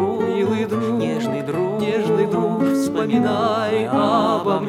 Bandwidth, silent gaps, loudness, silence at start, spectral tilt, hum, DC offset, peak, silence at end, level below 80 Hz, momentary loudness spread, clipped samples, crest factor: 15.5 kHz; none; -20 LUFS; 0 s; -6.5 dB/octave; none; under 0.1%; -4 dBFS; 0 s; -62 dBFS; 4 LU; under 0.1%; 14 dB